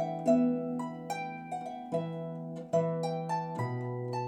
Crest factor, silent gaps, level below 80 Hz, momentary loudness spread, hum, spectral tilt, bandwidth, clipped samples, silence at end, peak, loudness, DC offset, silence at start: 18 dB; none; -82 dBFS; 12 LU; none; -7.5 dB/octave; 13 kHz; under 0.1%; 0 s; -14 dBFS; -33 LUFS; under 0.1%; 0 s